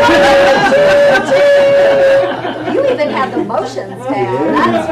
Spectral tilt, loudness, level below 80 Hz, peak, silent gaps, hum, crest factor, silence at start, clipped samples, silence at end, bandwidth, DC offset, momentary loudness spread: -4.5 dB/octave; -10 LUFS; -42 dBFS; -2 dBFS; none; none; 8 dB; 0 s; under 0.1%; 0 s; 12.5 kHz; under 0.1%; 10 LU